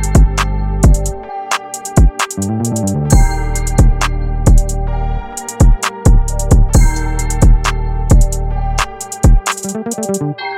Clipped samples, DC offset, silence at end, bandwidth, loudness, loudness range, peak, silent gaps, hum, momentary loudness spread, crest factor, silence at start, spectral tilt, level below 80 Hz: under 0.1%; under 0.1%; 0 s; 15.5 kHz; -15 LUFS; 2 LU; 0 dBFS; none; none; 8 LU; 12 dB; 0 s; -5.5 dB/octave; -14 dBFS